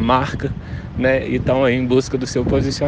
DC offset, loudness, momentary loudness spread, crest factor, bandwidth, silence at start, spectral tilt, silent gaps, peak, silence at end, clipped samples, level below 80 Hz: under 0.1%; -19 LUFS; 9 LU; 16 dB; 9.4 kHz; 0 s; -6 dB/octave; none; -2 dBFS; 0 s; under 0.1%; -34 dBFS